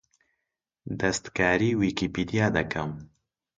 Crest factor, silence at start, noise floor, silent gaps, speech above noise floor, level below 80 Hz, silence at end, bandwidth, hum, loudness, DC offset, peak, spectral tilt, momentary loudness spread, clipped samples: 20 dB; 0.85 s; -84 dBFS; none; 58 dB; -50 dBFS; 0.55 s; 9.6 kHz; none; -26 LUFS; under 0.1%; -8 dBFS; -5.5 dB/octave; 14 LU; under 0.1%